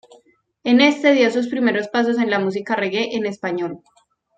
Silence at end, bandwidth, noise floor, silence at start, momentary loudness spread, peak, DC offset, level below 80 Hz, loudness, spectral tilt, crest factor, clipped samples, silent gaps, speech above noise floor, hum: 0.6 s; 8 kHz; -57 dBFS; 0.65 s; 11 LU; -2 dBFS; under 0.1%; -68 dBFS; -19 LUFS; -5 dB/octave; 18 dB; under 0.1%; none; 38 dB; none